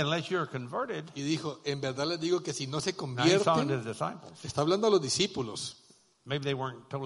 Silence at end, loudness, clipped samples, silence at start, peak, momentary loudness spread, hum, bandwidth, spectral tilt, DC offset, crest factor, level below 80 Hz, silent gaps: 0 s; -31 LUFS; under 0.1%; 0 s; -10 dBFS; 11 LU; none; 11.5 kHz; -4.5 dB/octave; under 0.1%; 20 dB; -68 dBFS; none